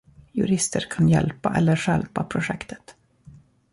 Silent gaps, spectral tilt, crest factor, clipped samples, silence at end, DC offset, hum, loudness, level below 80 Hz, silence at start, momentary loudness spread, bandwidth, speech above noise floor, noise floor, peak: none; -5.5 dB/octave; 16 dB; under 0.1%; 0.8 s; under 0.1%; none; -23 LUFS; -48 dBFS; 0.35 s; 13 LU; 11.5 kHz; 28 dB; -50 dBFS; -8 dBFS